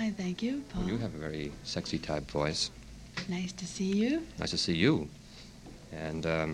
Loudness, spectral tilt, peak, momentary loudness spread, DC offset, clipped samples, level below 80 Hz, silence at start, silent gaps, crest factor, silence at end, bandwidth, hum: -33 LUFS; -5 dB/octave; -12 dBFS; 18 LU; under 0.1%; under 0.1%; -52 dBFS; 0 s; none; 22 dB; 0 s; 12.5 kHz; none